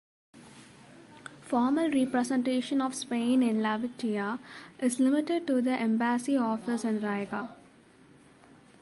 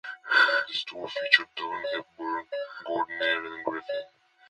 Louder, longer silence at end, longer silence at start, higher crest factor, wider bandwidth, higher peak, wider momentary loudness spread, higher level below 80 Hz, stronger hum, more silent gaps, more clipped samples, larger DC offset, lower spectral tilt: about the same, -29 LUFS vs -27 LUFS; first, 1.25 s vs 0.4 s; first, 0.35 s vs 0.05 s; second, 14 dB vs 26 dB; about the same, 11.5 kHz vs 11 kHz; second, -16 dBFS vs -4 dBFS; about the same, 11 LU vs 13 LU; about the same, -74 dBFS vs -74 dBFS; neither; neither; neither; neither; first, -5 dB/octave vs -2.5 dB/octave